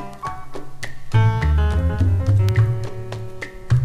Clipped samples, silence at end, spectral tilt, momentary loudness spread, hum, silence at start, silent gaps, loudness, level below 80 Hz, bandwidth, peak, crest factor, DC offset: under 0.1%; 0 s; -7.5 dB/octave; 17 LU; none; 0 s; none; -20 LUFS; -26 dBFS; 10.5 kHz; -4 dBFS; 14 dB; under 0.1%